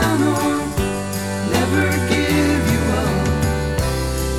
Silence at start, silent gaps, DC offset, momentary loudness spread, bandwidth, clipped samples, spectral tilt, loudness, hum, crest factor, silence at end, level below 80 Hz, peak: 0 s; none; 0.7%; 5 LU; 17.5 kHz; under 0.1%; -5.5 dB/octave; -19 LUFS; none; 14 dB; 0 s; -28 dBFS; -4 dBFS